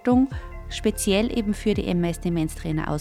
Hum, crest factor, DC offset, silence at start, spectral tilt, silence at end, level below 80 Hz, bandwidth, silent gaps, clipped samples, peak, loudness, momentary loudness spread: none; 16 dB; under 0.1%; 0.05 s; -5.5 dB/octave; 0 s; -36 dBFS; 16 kHz; none; under 0.1%; -8 dBFS; -24 LUFS; 6 LU